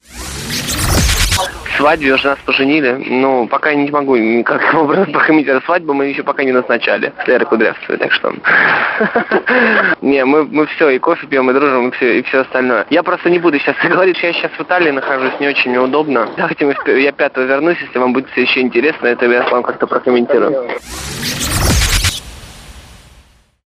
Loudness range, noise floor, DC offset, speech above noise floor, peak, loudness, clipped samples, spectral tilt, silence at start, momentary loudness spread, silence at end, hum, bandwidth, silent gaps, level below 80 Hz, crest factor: 2 LU; -47 dBFS; under 0.1%; 34 dB; 0 dBFS; -13 LUFS; under 0.1%; -4 dB/octave; 0.1 s; 5 LU; 0.75 s; none; 15.5 kHz; none; -30 dBFS; 12 dB